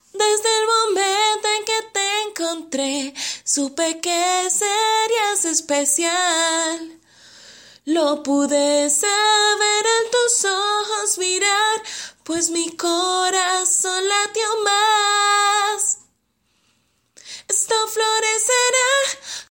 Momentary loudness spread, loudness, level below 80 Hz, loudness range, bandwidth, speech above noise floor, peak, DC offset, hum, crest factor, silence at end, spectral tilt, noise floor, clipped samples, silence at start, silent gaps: 8 LU; -18 LUFS; -70 dBFS; 3 LU; 16.5 kHz; 48 dB; -4 dBFS; under 0.1%; none; 16 dB; 0.15 s; 1 dB/octave; -67 dBFS; under 0.1%; 0.15 s; none